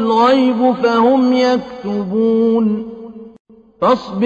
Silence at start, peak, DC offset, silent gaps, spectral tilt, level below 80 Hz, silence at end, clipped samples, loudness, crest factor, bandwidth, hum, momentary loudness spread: 0 s; -2 dBFS; under 0.1%; 3.40-3.45 s; -6.5 dB/octave; -54 dBFS; 0 s; under 0.1%; -14 LUFS; 12 dB; 7.8 kHz; none; 11 LU